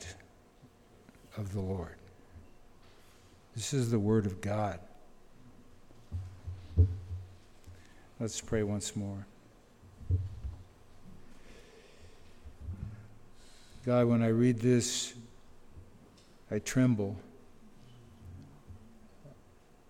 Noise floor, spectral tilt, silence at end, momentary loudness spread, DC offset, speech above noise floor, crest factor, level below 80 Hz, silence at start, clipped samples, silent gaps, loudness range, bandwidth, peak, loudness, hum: -60 dBFS; -6 dB/octave; 0.55 s; 27 LU; under 0.1%; 29 dB; 22 dB; -50 dBFS; 0 s; under 0.1%; none; 12 LU; 16 kHz; -14 dBFS; -33 LUFS; none